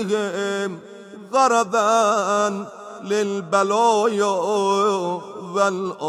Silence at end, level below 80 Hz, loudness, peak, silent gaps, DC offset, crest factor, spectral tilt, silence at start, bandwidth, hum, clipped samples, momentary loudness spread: 0 s; -74 dBFS; -20 LUFS; -4 dBFS; none; under 0.1%; 16 dB; -4 dB/octave; 0 s; 14.5 kHz; none; under 0.1%; 13 LU